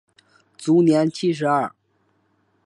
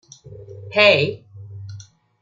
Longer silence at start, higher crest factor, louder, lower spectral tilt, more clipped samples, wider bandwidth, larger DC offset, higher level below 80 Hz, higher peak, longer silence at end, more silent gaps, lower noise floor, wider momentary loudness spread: first, 0.6 s vs 0.3 s; about the same, 16 dB vs 20 dB; second, -20 LUFS vs -16 LUFS; first, -6.5 dB/octave vs -4.5 dB/octave; neither; first, 11 kHz vs 7.6 kHz; neither; second, -72 dBFS vs -62 dBFS; second, -6 dBFS vs -2 dBFS; first, 0.95 s vs 0.4 s; neither; first, -66 dBFS vs -41 dBFS; second, 12 LU vs 26 LU